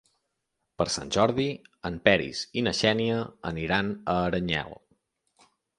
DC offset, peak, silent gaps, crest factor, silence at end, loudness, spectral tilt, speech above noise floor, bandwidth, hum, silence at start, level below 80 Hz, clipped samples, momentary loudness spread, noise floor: under 0.1%; -2 dBFS; none; 26 dB; 1.05 s; -27 LUFS; -4.5 dB/octave; 54 dB; 11.5 kHz; none; 0.8 s; -52 dBFS; under 0.1%; 10 LU; -80 dBFS